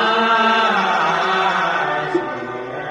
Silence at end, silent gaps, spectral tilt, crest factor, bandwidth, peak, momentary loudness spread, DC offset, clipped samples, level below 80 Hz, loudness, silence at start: 0 s; none; -4 dB/octave; 14 dB; 11.5 kHz; -4 dBFS; 12 LU; under 0.1%; under 0.1%; -58 dBFS; -17 LUFS; 0 s